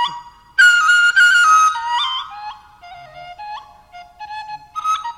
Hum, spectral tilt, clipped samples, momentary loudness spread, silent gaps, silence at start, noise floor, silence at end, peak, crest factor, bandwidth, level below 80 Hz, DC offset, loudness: none; 2.5 dB/octave; under 0.1%; 23 LU; none; 0 s; -41 dBFS; 0.05 s; -2 dBFS; 16 dB; 15 kHz; -58 dBFS; under 0.1%; -13 LUFS